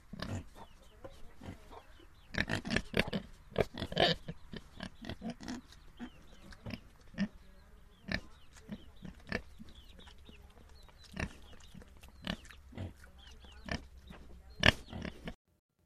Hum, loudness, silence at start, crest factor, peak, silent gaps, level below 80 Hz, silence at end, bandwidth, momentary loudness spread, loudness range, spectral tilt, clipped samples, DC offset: none; -38 LUFS; 0.1 s; 34 dB; -6 dBFS; none; -52 dBFS; 0.5 s; 15 kHz; 25 LU; 12 LU; -4.5 dB/octave; under 0.1%; under 0.1%